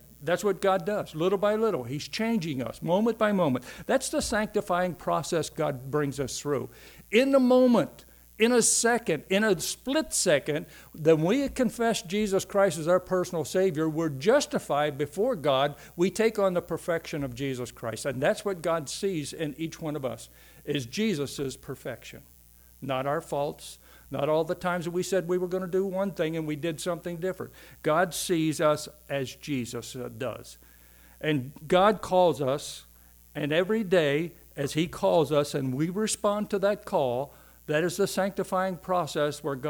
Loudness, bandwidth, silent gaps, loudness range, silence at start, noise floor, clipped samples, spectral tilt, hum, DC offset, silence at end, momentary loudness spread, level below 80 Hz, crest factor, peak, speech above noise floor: -27 LUFS; over 20 kHz; none; 7 LU; 0.2 s; -55 dBFS; under 0.1%; -4.5 dB/octave; none; under 0.1%; 0 s; 11 LU; -56 dBFS; 18 dB; -8 dBFS; 28 dB